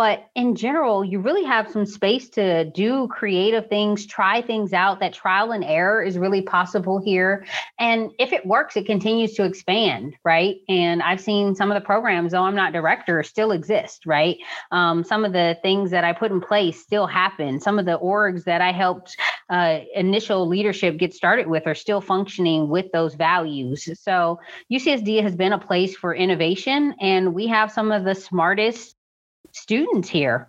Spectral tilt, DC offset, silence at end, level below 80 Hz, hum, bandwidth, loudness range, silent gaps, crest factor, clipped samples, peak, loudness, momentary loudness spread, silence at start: -5.5 dB/octave; under 0.1%; 0.05 s; -68 dBFS; none; 8 kHz; 1 LU; 28.97-29.44 s; 16 dB; under 0.1%; -4 dBFS; -21 LUFS; 4 LU; 0 s